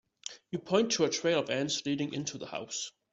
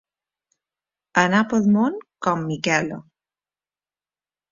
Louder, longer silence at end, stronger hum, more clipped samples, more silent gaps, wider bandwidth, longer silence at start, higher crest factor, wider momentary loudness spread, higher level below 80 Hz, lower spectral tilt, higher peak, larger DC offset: second, -32 LUFS vs -21 LUFS; second, 0.25 s vs 1.5 s; neither; neither; neither; about the same, 8.2 kHz vs 7.6 kHz; second, 0.25 s vs 1.15 s; about the same, 22 dB vs 22 dB; first, 12 LU vs 8 LU; second, -72 dBFS vs -62 dBFS; second, -3.5 dB/octave vs -5.5 dB/octave; second, -12 dBFS vs -2 dBFS; neither